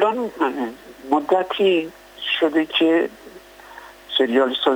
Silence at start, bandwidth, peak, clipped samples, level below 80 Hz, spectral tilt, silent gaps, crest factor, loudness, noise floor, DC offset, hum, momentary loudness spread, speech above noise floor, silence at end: 0 s; 20 kHz; -6 dBFS; under 0.1%; -60 dBFS; -4.5 dB/octave; none; 14 dB; -20 LUFS; -42 dBFS; under 0.1%; none; 17 LU; 23 dB; 0 s